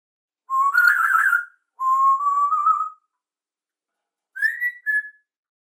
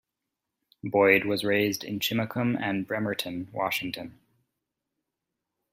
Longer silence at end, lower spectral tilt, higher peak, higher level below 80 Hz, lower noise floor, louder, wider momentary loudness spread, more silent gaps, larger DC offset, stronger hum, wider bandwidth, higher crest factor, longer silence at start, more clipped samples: second, 0.5 s vs 1.65 s; second, 7 dB/octave vs -5 dB/octave; about the same, -4 dBFS vs -6 dBFS; second, under -90 dBFS vs -68 dBFS; first, under -90 dBFS vs -85 dBFS; first, -19 LUFS vs -27 LUFS; second, 10 LU vs 14 LU; neither; neither; neither; about the same, 17 kHz vs 16 kHz; about the same, 18 dB vs 22 dB; second, 0.5 s vs 0.85 s; neither